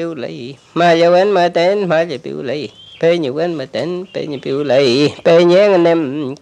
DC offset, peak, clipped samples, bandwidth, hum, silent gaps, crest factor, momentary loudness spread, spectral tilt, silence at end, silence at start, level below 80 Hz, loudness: under 0.1%; 0 dBFS; under 0.1%; 9.6 kHz; none; none; 14 dB; 14 LU; -6 dB/octave; 0.05 s; 0 s; -64 dBFS; -14 LUFS